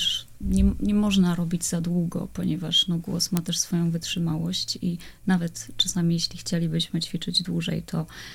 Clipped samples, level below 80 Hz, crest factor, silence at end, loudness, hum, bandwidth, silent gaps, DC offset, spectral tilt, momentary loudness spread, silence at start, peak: under 0.1%; -38 dBFS; 20 dB; 0 s; -25 LUFS; none; 17.5 kHz; none; under 0.1%; -4.5 dB/octave; 8 LU; 0 s; -4 dBFS